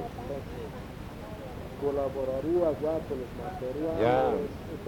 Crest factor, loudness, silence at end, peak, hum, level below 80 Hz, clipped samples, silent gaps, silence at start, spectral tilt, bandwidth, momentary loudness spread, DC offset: 20 dB; -31 LUFS; 0 s; -12 dBFS; none; -48 dBFS; under 0.1%; none; 0 s; -7.5 dB/octave; 18 kHz; 15 LU; under 0.1%